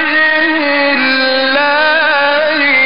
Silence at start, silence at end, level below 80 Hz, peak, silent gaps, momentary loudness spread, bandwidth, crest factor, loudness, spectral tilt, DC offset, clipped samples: 0 s; 0 s; -58 dBFS; -2 dBFS; none; 1 LU; 5.4 kHz; 8 dB; -10 LUFS; 1.5 dB/octave; 2%; under 0.1%